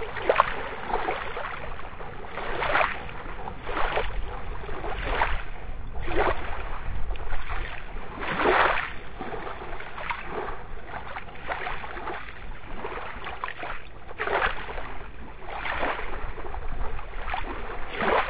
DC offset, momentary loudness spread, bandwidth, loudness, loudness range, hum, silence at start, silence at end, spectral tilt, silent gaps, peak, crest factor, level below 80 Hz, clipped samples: 1%; 15 LU; 4 kHz; -31 LUFS; 7 LU; none; 0 s; 0 s; -8.5 dB/octave; none; -2 dBFS; 26 dB; -38 dBFS; under 0.1%